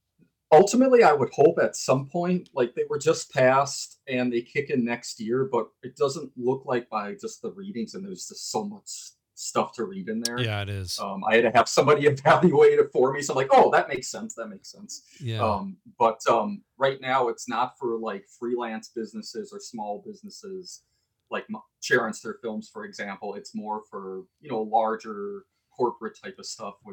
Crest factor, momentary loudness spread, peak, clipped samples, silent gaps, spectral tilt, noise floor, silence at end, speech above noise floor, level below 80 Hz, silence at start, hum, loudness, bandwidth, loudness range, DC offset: 18 dB; 19 LU; -8 dBFS; under 0.1%; none; -5 dB/octave; -66 dBFS; 0 s; 41 dB; -68 dBFS; 0.5 s; none; -24 LUFS; 19.5 kHz; 11 LU; under 0.1%